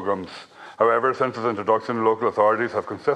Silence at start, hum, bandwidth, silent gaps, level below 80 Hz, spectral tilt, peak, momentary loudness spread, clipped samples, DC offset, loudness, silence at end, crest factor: 0 s; none; 9.6 kHz; none; -70 dBFS; -6.5 dB/octave; -4 dBFS; 12 LU; under 0.1%; under 0.1%; -22 LUFS; 0 s; 18 dB